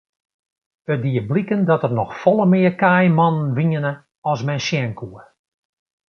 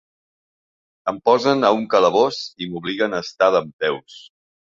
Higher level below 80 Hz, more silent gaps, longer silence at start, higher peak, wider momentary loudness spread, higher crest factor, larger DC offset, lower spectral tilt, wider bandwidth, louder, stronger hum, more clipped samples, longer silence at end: about the same, -58 dBFS vs -62 dBFS; about the same, 4.18-4.22 s vs 3.73-3.79 s; second, 0.9 s vs 1.05 s; about the same, -2 dBFS vs -2 dBFS; about the same, 12 LU vs 12 LU; about the same, 18 dB vs 18 dB; neither; first, -7.5 dB/octave vs -5 dB/octave; second, 6.8 kHz vs 7.6 kHz; about the same, -18 LUFS vs -19 LUFS; neither; neither; first, 0.9 s vs 0.45 s